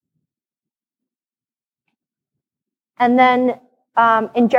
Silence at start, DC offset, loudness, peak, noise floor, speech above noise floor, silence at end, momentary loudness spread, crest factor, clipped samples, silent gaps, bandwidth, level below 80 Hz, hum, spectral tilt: 3 s; under 0.1%; -16 LUFS; -2 dBFS; under -90 dBFS; over 76 dB; 0 s; 9 LU; 18 dB; under 0.1%; none; 6.6 kHz; -74 dBFS; none; -6.5 dB/octave